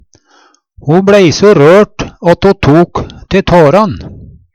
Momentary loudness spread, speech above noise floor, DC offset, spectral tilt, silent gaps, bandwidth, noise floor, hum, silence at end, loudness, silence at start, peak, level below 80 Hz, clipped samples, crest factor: 10 LU; 41 dB; under 0.1%; -6.5 dB/octave; none; 11 kHz; -47 dBFS; none; 0.3 s; -7 LUFS; 0.85 s; 0 dBFS; -32 dBFS; 0.4%; 8 dB